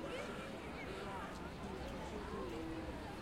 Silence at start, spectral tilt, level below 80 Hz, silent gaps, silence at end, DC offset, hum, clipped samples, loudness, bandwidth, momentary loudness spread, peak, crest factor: 0 s; -5.5 dB/octave; -56 dBFS; none; 0 s; under 0.1%; none; under 0.1%; -46 LUFS; 16 kHz; 2 LU; -34 dBFS; 12 dB